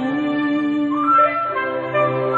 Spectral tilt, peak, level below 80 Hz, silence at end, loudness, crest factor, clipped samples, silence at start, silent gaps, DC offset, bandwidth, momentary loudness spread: -8 dB/octave; -6 dBFS; -60 dBFS; 0 s; -18 LUFS; 14 dB; under 0.1%; 0 s; none; under 0.1%; 6.8 kHz; 7 LU